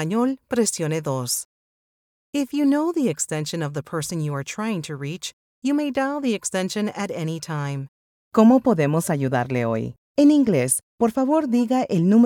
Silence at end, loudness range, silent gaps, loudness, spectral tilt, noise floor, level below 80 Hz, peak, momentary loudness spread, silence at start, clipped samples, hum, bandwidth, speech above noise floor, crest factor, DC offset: 0 s; 6 LU; 1.45-2.33 s, 5.33-5.62 s, 7.88-8.31 s, 9.98-10.15 s, 10.83-10.98 s; -22 LUFS; -5.5 dB/octave; under -90 dBFS; -62 dBFS; -4 dBFS; 11 LU; 0 s; under 0.1%; none; 18 kHz; over 69 dB; 18 dB; under 0.1%